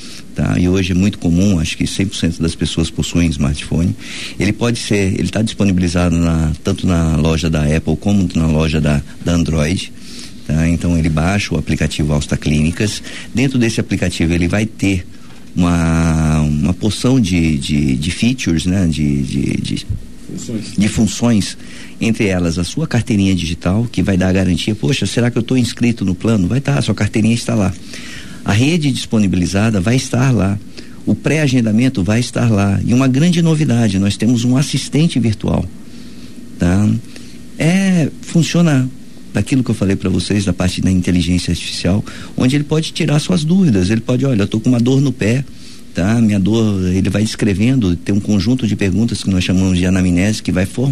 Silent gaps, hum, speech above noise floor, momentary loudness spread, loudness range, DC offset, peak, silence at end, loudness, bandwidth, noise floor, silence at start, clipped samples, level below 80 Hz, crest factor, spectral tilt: none; none; 20 dB; 7 LU; 3 LU; 3%; -2 dBFS; 0 s; -15 LUFS; 13.5 kHz; -34 dBFS; 0 s; under 0.1%; -32 dBFS; 12 dB; -6 dB/octave